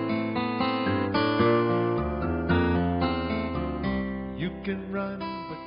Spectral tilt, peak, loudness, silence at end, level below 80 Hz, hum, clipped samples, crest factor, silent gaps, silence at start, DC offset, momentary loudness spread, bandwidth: -5.5 dB/octave; -10 dBFS; -27 LUFS; 0 s; -42 dBFS; none; under 0.1%; 16 dB; none; 0 s; under 0.1%; 10 LU; 5.4 kHz